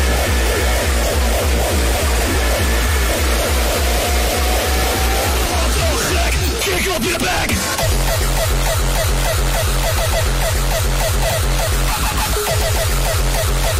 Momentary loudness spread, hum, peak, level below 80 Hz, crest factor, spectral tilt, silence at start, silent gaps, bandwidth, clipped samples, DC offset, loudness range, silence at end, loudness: 1 LU; none; -4 dBFS; -20 dBFS; 12 dB; -3.5 dB/octave; 0 s; none; 16 kHz; under 0.1%; under 0.1%; 1 LU; 0 s; -17 LUFS